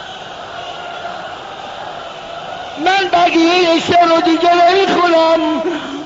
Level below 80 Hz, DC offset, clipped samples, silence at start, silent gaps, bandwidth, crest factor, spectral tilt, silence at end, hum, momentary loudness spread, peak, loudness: -52 dBFS; under 0.1%; under 0.1%; 0 s; none; 7.8 kHz; 12 dB; -1.5 dB/octave; 0 s; none; 17 LU; -2 dBFS; -12 LUFS